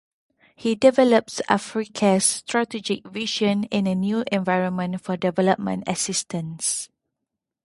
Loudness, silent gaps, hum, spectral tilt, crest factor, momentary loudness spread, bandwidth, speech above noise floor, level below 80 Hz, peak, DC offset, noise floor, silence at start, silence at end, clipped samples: -22 LUFS; none; none; -4 dB/octave; 22 dB; 9 LU; 11.5 kHz; 61 dB; -64 dBFS; 0 dBFS; under 0.1%; -83 dBFS; 0.6 s; 0.8 s; under 0.1%